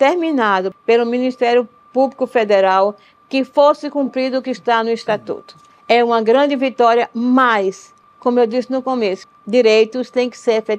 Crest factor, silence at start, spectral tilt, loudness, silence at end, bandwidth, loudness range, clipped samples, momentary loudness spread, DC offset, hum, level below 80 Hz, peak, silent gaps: 14 dB; 0 s; -5 dB/octave; -16 LUFS; 0 s; 9.2 kHz; 2 LU; under 0.1%; 8 LU; under 0.1%; none; -70 dBFS; -2 dBFS; none